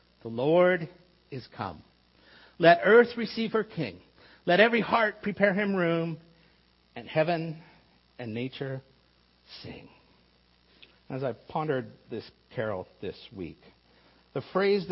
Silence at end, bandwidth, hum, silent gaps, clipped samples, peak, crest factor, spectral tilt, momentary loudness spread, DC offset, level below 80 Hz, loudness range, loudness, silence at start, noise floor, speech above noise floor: 0 s; 5.8 kHz; 60 Hz at -60 dBFS; none; under 0.1%; -6 dBFS; 22 dB; -9.5 dB/octave; 22 LU; under 0.1%; -66 dBFS; 15 LU; -27 LUFS; 0.25 s; -64 dBFS; 37 dB